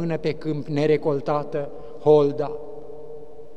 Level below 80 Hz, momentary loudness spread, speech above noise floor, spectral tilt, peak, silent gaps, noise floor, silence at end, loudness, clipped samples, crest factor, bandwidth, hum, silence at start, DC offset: -58 dBFS; 22 LU; 19 dB; -8 dB/octave; -4 dBFS; none; -41 dBFS; 0.05 s; -23 LUFS; under 0.1%; 18 dB; 7.6 kHz; none; 0 s; 2%